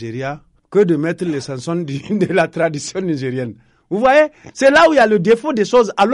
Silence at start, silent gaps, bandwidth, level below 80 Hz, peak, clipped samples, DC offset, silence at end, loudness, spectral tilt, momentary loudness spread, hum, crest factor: 0 s; none; 11.5 kHz; -52 dBFS; -2 dBFS; under 0.1%; under 0.1%; 0 s; -16 LUFS; -5.5 dB/octave; 14 LU; none; 14 dB